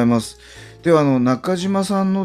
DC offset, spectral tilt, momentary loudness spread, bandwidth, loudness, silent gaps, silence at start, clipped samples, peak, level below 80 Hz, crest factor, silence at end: under 0.1%; -6.5 dB/octave; 8 LU; 14.5 kHz; -18 LUFS; none; 0 s; under 0.1%; -4 dBFS; -52 dBFS; 14 dB; 0 s